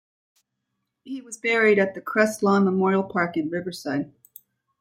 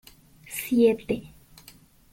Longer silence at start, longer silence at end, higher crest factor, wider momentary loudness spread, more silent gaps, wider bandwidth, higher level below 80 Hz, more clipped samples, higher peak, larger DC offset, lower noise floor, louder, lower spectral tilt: first, 1.05 s vs 0.5 s; second, 0.7 s vs 0.85 s; about the same, 18 dB vs 18 dB; about the same, 15 LU vs 13 LU; neither; about the same, 16.5 kHz vs 17 kHz; second, -68 dBFS vs -56 dBFS; neither; first, -6 dBFS vs -10 dBFS; neither; first, -79 dBFS vs -53 dBFS; first, -22 LUFS vs -25 LUFS; about the same, -6 dB/octave vs -5 dB/octave